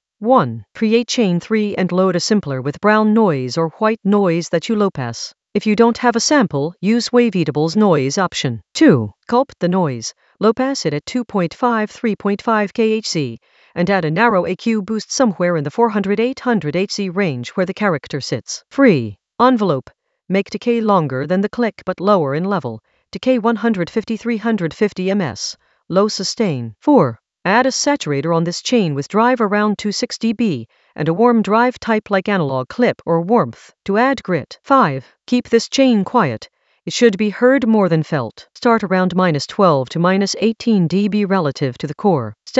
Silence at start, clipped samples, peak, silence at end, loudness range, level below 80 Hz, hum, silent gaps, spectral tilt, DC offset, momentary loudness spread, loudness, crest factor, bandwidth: 0.2 s; under 0.1%; 0 dBFS; 0 s; 3 LU; -58 dBFS; none; none; -5.5 dB/octave; under 0.1%; 8 LU; -17 LUFS; 16 dB; 8.2 kHz